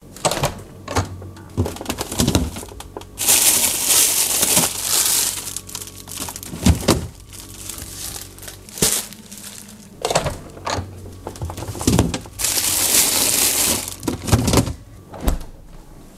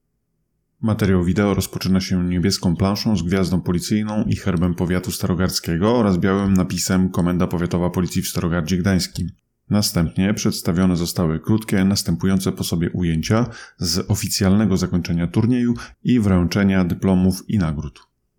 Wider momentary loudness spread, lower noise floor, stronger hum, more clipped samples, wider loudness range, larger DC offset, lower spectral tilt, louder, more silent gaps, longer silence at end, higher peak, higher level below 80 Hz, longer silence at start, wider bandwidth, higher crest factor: first, 21 LU vs 5 LU; second, -40 dBFS vs -71 dBFS; neither; neither; first, 9 LU vs 2 LU; neither; second, -2.5 dB/octave vs -5.5 dB/octave; about the same, -18 LUFS vs -20 LUFS; neither; second, 0 s vs 0.5 s; first, 0 dBFS vs -6 dBFS; first, -34 dBFS vs -40 dBFS; second, 0.05 s vs 0.8 s; second, 16 kHz vs 19 kHz; first, 22 dB vs 12 dB